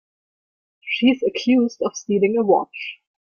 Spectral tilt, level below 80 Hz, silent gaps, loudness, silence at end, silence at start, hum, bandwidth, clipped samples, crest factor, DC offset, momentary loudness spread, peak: -5 dB/octave; -66 dBFS; none; -20 LUFS; 0.4 s; 0.85 s; none; 6.8 kHz; under 0.1%; 16 dB; under 0.1%; 13 LU; -4 dBFS